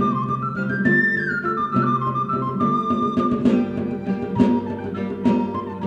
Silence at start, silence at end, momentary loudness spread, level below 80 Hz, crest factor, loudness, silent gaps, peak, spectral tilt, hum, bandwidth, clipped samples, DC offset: 0 s; 0 s; 7 LU; -54 dBFS; 18 dB; -21 LUFS; none; -4 dBFS; -8.5 dB/octave; none; 7.6 kHz; under 0.1%; under 0.1%